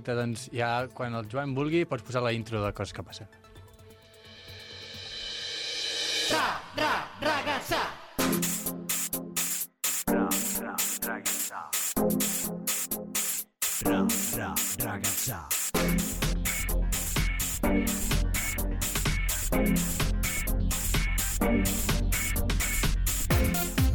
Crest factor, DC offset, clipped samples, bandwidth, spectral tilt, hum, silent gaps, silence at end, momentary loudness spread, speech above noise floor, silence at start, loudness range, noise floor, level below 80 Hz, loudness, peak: 16 dB; under 0.1%; under 0.1%; 19 kHz; -3.5 dB/octave; none; none; 0 s; 7 LU; 22 dB; 0 s; 5 LU; -53 dBFS; -36 dBFS; -28 LUFS; -14 dBFS